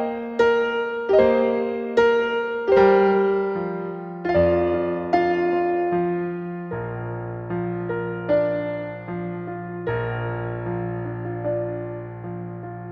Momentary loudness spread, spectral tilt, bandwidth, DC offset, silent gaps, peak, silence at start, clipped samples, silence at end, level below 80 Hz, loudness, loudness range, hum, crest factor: 13 LU; -8.5 dB/octave; 6.8 kHz; under 0.1%; none; -4 dBFS; 0 s; under 0.1%; 0 s; -50 dBFS; -23 LUFS; 9 LU; none; 18 dB